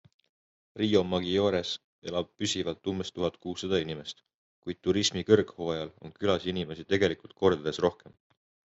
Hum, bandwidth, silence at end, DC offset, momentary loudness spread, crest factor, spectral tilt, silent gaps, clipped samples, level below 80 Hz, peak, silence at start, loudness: none; 8 kHz; 0.75 s; under 0.1%; 12 LU; 24 dB; -5 dB/octave; 1.84-2.02 s, 4.34-4.62 s; under 0.1%; -66 dBFS; -6 dBFS; 0.75 s; -29 LUFS